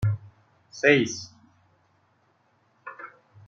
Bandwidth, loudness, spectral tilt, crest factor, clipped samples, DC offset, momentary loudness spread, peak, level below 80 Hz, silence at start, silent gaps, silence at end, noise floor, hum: 7.6 kHz; -24 LUFS; -5 dB/octave; 26 dB; under 0.1%; under 0.1%; 25 LU; -4 dBFS; -56 dBFS; 0 s; none; 0.4 s; -66 dBFS; none